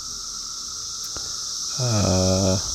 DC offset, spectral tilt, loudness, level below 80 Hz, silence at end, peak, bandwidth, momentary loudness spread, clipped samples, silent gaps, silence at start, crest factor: under 0.1%; -4 dB/octave; -23 LUFS; -48 dBFS; 0 s; -8 dBFS; 16 kHz; 10 LU; under 0.1%; none; 0 s; 16 dB